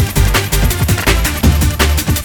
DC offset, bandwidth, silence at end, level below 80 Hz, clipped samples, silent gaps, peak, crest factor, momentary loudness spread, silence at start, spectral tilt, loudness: under 0.1%; over 20 kHz; 0 s; -16 dBFS; under 0.1%; none; 0 dBFS; 12 dB; 1 LU; 0 s; -4 dB/octave; -13 LUFS